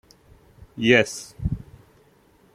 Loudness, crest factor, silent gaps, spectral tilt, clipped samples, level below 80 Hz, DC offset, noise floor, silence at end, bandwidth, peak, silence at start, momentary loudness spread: -22 LUFS; 24 dB; none; -4.5 dB/octave; under 0.1%; -42 dBFS; under 0.1%; -57 dBFS; 0.95 s; 14.5 kHz; -2 dBFS; 0.75 s; 17 LU